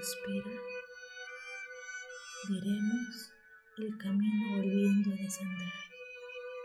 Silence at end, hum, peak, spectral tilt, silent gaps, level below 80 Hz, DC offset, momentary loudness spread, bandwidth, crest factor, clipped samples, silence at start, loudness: 0 s; none; -20 dBFS; -5.5 dB/octave; none; -80 dBFS; under 0.1%; 16 LU; 14 kHz; 16 dB; under 0.1%; 0 s; -36 LUFS